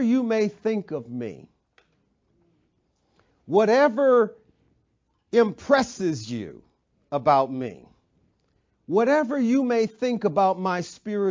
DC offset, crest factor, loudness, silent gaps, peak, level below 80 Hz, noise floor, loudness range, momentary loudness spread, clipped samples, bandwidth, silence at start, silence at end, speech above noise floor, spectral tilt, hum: under 0.1%; 20 dB; -23 LUFS; none; -4 dBFS; -66 dBFS; -71 dBFS; 6 LU; 14 LU; under 0.1%; 7.6 kHz; 0 s; 0 s; 49 dB; -6 dB/octave; none